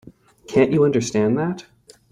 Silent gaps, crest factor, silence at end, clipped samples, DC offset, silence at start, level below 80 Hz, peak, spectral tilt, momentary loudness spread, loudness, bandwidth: none; 18 dB; 0.5 s; under 0.1%; under 0.1%; 0.05 s; -54 dBFS; -2 dBFS; -6.5 dB/octave; 9 LU; -19 LUFS; 10.5 kHz